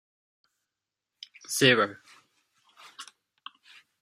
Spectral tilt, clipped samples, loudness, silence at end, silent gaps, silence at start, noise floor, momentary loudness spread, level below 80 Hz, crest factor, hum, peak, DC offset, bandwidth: -3 dB/octave; under 0.1%; -24 LUFS; 1 s; none; 1.5 s; -88 dBFS; 27 LU; -76 dBFS; 26 dB; none; -6 dBFS; under 0.1%; 16 kHz